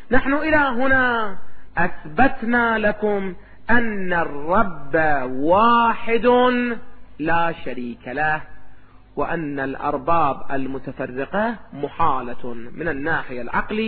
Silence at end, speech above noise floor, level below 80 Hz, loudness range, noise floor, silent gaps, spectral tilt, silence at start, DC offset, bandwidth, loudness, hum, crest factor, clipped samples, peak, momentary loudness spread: 0 s; 20 dB; -40 dBFS; 6 LU; -39 dBFS; none; -9.5 dB/octave; 0 s; under 0.1%; 4.7 kHz; -21 LUFS; none; 18 dB; under 0.1%; -2 dBFS; 13 LU